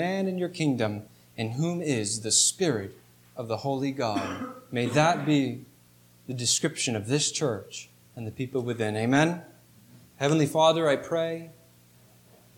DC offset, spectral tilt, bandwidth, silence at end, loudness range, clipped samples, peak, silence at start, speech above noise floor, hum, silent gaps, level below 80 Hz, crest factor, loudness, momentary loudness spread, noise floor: under 0.1%; -4 dB/octave; 19 kHz; 1.05 s; 3 LU; under 0.1%; -8 dBFS; 0 s; 31 dB; 60 Hz at -55 dBFS; none; -70 dBFS; 20 dB; -26 LUFS; 18 LU; -58 dBFS